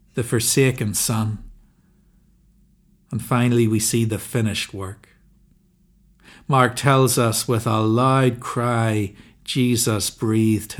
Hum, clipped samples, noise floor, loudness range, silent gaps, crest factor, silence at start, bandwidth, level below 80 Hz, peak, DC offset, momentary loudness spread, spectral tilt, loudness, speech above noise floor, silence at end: none; under 0.1%; -58 dBFS; 5 LU; none; 20 dB; 0.15 s; 18 kHz; -52 dBFS; -2 dBFS; under 0.1%; 13 LU; -5 dB/octave; -20 LUFS; 38 dB; 0 s